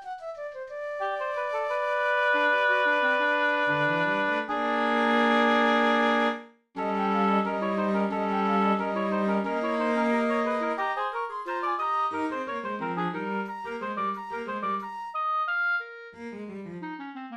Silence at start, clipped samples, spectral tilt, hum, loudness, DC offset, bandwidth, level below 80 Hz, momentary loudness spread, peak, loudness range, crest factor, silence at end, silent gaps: 0 s; under 0.1%; -6 dB/octave; none; -26 LUFS; under 0.1%; 11.5 kHz; -72 dBFS; 15 LU; -10 dBFS; 7 LU; 16 dB; 0 s; none